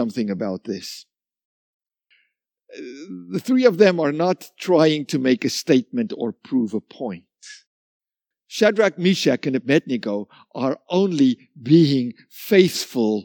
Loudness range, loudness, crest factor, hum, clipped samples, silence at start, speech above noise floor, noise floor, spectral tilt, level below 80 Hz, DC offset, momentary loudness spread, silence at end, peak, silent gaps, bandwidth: 6 LU; -20 LUFS; 20 dB; none; under 0.1%; 0 s; 54 dB; -74 dBFS; -5.5 dB/octave; -74 dBFS; under 0.1%; 16 LU; 0 s; -2 dBFS; 1.45-1.80 s, 7.67-8.00 s; 19 kHz